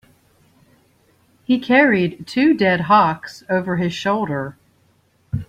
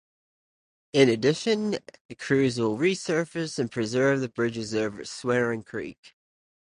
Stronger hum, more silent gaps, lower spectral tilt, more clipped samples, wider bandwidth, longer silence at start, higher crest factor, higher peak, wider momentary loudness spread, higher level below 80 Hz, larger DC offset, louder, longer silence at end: neither; second, none vs 2.00-2.09 s, 5.98-6.03 s; first, -6.5 dB/octave vs -5 dB/octave; neither; first, 13.5 kHz vs 11 kHz; first, 1.5 s vs 0.95 s; about the same, 18 dB vs 20 dB; first, -2 dBFS vs -6 dBFS; first, 15 LU vs 12 LU; first, -52 dBFS vs -64 dBFS; neither; first, -18 LUFS vs -26 LUFS; second, 0.05 s vs 0.7 s